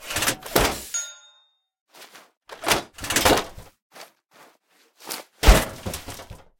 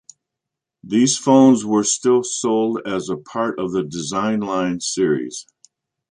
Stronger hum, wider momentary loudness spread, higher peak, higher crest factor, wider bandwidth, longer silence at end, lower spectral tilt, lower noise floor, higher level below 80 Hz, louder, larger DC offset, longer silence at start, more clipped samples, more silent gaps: neither; first, 20 LU vs 11 LU; about the same, 0 dBFS vs -2 dBFS; first, 26 dB vs 16 dB; first, 19 kHz vs 10.5 kHz; second, 0.25 s vs 0.7 s; second, -3 dB/octave vs -4.5 dB/octave; second, -62 dBFS vs -83 dBFS; first, -30 dBFS vs -60 dBFS; second, -23 LUFS vs -18 LUFS; neither; second, 0 s vs 0.85 s; neither; first, 1.81-1.86 s, 2.37-2.41 s, 3.82-3.90 s vs none